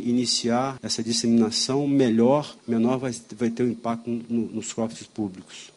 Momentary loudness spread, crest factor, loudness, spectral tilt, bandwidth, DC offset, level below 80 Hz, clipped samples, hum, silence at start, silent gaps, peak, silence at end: 11 LU; 16 dB; -24 LUFS; -4.5 dB/octave; 11.5 kHz; under 0.1%; -64 dBFS; under 0.1%; none; 0 s; none; -8 dBFS; 0.1 s